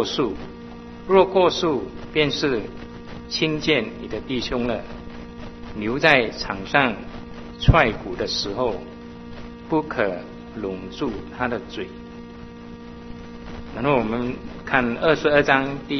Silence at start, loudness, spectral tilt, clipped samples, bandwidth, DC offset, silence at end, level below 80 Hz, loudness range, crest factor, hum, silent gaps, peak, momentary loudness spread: 0 s; -22 LUFS; -5.5 dB/octave; under 0.1%; 6.4 kHz; under 0.1%; 0 s; -40 dBFS; 7 LU; 24 dB; 60 Hz at -45 dBFS; none; 0 dBFS; 21 LU